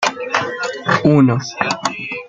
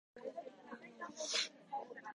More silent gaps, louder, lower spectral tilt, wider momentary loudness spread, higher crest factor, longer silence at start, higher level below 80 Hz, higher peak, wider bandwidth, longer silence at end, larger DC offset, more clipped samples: neither; first, -17 LUFS vs -43 LUFS; first, -5.5 dB/octave vs 0 dB/octave; second, 10 LU vs 16 LU; second, 16 dB vs 24 dB; second, 0 s vs 0.15 s; first, -56 dBFS vs under -90 dBFS; first, -2 dBFS vs -22 dBFS; second, 9 kHz vs 11 kHz; about the same, 0 s vs 0 s; neither; neither